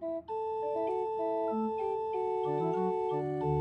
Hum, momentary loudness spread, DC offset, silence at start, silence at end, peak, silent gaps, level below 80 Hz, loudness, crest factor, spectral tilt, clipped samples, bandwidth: none; 3 LU; under 0.1%; 0 s; 0 s; -20 dBFS; none; -62 dBFS; -33 LUFS; 12 dB; -9.5 dB/octave; under 0.1%; 8.4 kHz